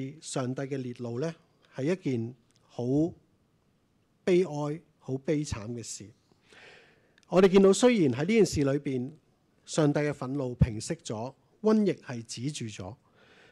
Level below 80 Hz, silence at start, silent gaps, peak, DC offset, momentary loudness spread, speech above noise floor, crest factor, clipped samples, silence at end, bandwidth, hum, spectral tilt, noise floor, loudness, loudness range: -50 dBFS; 0 s; none; -12 dBFS; under 0.1%; 16 LU; 42 dB; 18 dB; under 0.1%; 0.55 s; 12.5 kHz; none; -6 dB/octave; -69 dBFS; -29 LUFS; 8 LU